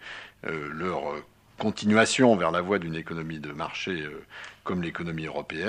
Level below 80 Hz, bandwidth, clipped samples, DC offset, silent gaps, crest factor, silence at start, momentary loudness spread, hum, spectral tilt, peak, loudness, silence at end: -60 dBFS; 11 kHz; under 0.1%; under 0.1%; none; 22 dB; 0 s; 17 LU; none; -5 dB/octave; -6 dBFS; -27 LUFS; 0 s